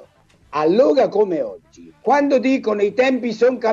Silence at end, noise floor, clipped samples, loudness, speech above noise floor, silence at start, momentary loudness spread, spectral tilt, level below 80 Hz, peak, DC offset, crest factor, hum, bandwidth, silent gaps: 0 s; -52 dBFS; under 0.1%; -18 LUFS; 35 dB; 0.5 s; 10 LU; -6 dB/octave; -62 dBFS; -4 dBFS; under 0.1%; 14 dB; none; 7.6 kHz; none